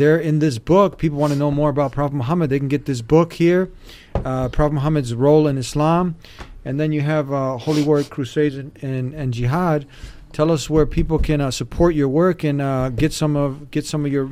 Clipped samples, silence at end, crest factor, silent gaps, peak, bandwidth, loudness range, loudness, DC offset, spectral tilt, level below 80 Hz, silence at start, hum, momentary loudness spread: under 0.1%; 0 s; 16 dB; none; -2 dBFS; 15 kHz; 3 LU; -19 LUFS; under 0.1%; -7 dB/octave; -34 dBFS; 0 s; none; 9 LU